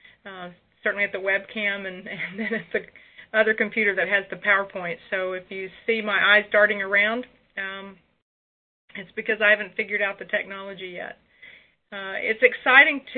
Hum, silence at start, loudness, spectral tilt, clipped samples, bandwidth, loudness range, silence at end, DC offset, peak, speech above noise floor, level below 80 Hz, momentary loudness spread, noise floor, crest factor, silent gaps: none; 0.25 s; -22 LUFS; -7.5 dB/octave; under 0.1%; 4.7 kHz; 5 LU; 0 s; under 0.1%; -2 dBFS; 27 dB; -68 dBFS; 19 LU; -50 dBFS; 24 dB; 8.22-8.88 s